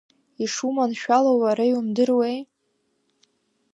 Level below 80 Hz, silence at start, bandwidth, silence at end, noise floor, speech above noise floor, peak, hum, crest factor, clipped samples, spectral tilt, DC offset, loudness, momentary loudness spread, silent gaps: -80 dBFS; 0.4 s; 11 kHz; 1.3 s; -71 dBFS; 50 dB; -6 dBFS; none; 18 dB; under 0.1%; -4.5 dB/octave; under 0.1%; -22 LUFS; 9 LU; none